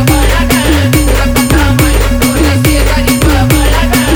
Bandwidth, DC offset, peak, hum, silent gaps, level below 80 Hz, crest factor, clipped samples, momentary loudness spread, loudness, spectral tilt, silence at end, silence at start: over 20 kHz; under 0.1%; 0 dBFS; none; none; -12 dBFS; 8 dB; under 0.1%; 1 LU; -9 LUFS; -5 dB/octave; 0 s; 0 s